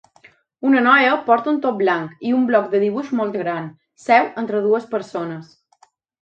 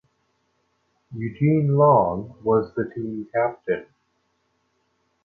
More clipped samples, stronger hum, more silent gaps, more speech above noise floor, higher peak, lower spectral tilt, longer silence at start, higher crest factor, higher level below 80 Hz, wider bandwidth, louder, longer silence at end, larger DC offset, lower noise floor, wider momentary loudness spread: neither; neither; neither; second, 39 dB vs 49 dB; first, 0 dBFS vs -6 dBFS; second, -6.5 dB/octave vs -12 dB/octave; second, 0.6 s vs 1.1 s; about the same, 18 dB vs 18 dB; second, -72 dBFS vs -56 dBFS; first, 8.6 kHz vs 4.5 kHz; first, -18 LUFS vs -22 LUFS; second, 0.8 s vs 1.4 s; neither; second, -57 dBFS vs -70 dBFS; about the same, 14 LU vs 15 LU